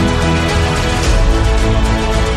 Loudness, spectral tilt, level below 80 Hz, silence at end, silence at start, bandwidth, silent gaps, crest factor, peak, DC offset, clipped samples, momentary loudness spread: -14 LUFS; -5 dB/octave; -16 dBFS; 0 s; 0 s; 13.5 kHz; none; 10 dB; -2 dBFS; under 0.1%; under 0.1%; 1 LU